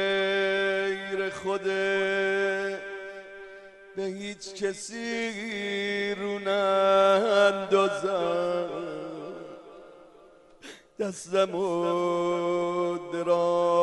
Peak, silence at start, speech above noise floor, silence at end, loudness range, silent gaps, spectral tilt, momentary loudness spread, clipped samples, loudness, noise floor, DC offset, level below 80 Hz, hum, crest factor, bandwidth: -10 dBFS; 0 s; 28 dB; 0 s; 9 LU; none; -4.5 dB/octave; 18 LU; under 0.1%; -27 LUFS; -54 dBFS; under 0.1%; -70 dBFS; none; 18 dB; 11.5 kHz